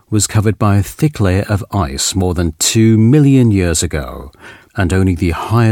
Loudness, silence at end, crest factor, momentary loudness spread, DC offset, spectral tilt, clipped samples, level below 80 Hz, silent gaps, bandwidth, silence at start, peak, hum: -13 LUFS; 0 s; 12 dB; 10 LU; under 0.1%; -5.5 dB/octave; under 0.1%; -32 dBFS; none; 17 kHz; 0.1 s; 0 dBFS; none